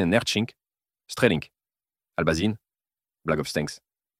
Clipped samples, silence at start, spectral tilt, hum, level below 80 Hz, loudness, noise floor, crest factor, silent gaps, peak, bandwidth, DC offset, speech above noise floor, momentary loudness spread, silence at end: under 0.1%; 0 s; -5 dB/octave; none; -52 dBFS; -26 LUFS; under -90 dBFS; 24 dB; none; -4 dBFS; 16 kHz; under 0.1%; over 65 dB; 15 LU; 0.4 s